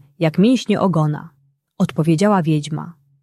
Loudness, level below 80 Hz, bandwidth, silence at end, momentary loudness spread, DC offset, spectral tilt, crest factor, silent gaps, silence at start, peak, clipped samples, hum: -17 LUFS; -58 dBFS; 12.5 kHz; 0.3 s; 13 LU; under 0.1%; -7 dB/octave; 16 dB; none; 0.2 s; -2 dBFS; under 0.1%; none